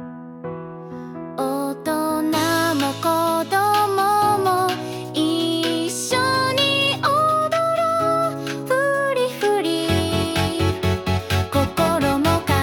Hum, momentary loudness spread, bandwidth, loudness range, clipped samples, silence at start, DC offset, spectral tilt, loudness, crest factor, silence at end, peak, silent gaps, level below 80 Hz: none; 10 LU; 18 kHz; 2 LU; under 0.1%; 0 s; under 0.1%; -4.5 dB/octave; -20 LUFS; 14 dB; 0 s; -6 dBFS; none; -48 dBFS